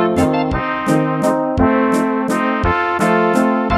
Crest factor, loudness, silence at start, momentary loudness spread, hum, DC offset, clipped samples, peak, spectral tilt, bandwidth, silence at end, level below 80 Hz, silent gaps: 14 dB; -16 LUFS; 0 s; 3 LU; none; under 0.1%; under 0.1%; -2 dBFS; -6.5 dB/octave; 14.5 kHz; 0 s; -32 dBFS; none